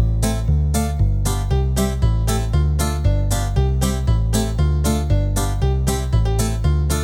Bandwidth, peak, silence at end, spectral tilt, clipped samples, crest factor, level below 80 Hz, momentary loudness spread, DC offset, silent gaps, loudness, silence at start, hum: 17 kHz; -6 dBFS; 0 s; -6 dB/octave; under 0.1%; 12 dB; -20 dBFS; 1 LU; under 0.1%; none; -20 LUFS; 0 s; none